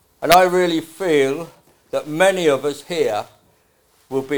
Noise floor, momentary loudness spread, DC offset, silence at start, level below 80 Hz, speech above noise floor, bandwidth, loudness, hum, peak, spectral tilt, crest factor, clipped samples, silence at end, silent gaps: -59 dBFS; 14 LU; 0.2%; 0.2 s; -54 dBFS; 41 dB; over 20 kHz; -18 LUFS; none; 0 dBFS; -4 dB/octave; 20 dB; under 0.1%; 0 s; none